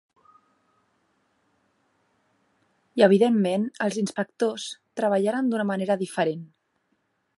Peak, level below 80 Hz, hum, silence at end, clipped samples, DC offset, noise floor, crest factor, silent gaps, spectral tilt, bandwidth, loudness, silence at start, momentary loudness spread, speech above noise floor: -4 dBFS; -78 dBFS; none; 0.95 s; under 0.1%; under 0.1%; -73 dBFS; 22 dB; none; -6 dB/octave; 11.5 kHz; -24 LUFS; 2.95 s; 12 LU; 49 dB